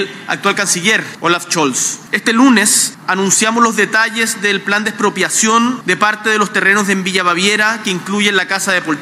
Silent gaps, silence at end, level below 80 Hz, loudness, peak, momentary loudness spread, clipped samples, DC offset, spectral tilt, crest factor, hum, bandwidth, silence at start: none; 0 s; -66 dBFS; -13 LUFS; 0 dBFS; 5 LU; under 0.1%; under 0.1%; -2 dB/octave; 14 dB; none; 16 kHz; 0 s